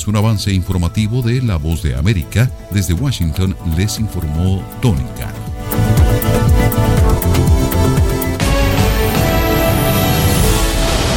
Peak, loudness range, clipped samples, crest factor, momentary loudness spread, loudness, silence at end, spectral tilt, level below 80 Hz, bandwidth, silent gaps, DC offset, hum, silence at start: 0 dBFS; 4 LU; under 0.1%; 14 dB; 5 LU; -15 LUFS; 0 s; -5.5 dB/octave; -20 dBFS; 17 kHz; none; under 0.1%; none; 0 s